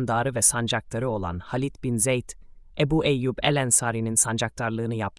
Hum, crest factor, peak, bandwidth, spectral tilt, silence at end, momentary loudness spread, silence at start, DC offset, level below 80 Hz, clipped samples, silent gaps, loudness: none; 18 dB; -6 dBFS; 12 kHz; -3.5 dB/octave; 0.1 s; 9 LU; 0 s; under 0.1%; -48 dBFS; under 0.1%; none; -24 LUFS